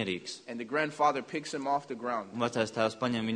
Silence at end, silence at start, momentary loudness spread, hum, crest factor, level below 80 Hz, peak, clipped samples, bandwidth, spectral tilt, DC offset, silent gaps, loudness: 0 s; 0 s; 8 LU; none; 20 dB; -72 dBFS; -12 dBFS; under 0.1%; 10.5 kHz; -4.5 dB/octave; under 0.1%; none; -32 LUFS